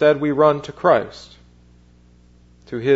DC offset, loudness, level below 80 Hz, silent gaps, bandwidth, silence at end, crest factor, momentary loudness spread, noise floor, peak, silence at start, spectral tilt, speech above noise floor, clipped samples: under 0.1%; -18 LUFS; -52 dBFS; none; 8 kHz; 0 s; 18 dB; 18 LU; -50 dBFS; -2 dBFS; 0 s; -7 dB/octave; 33 dB; under 0.1%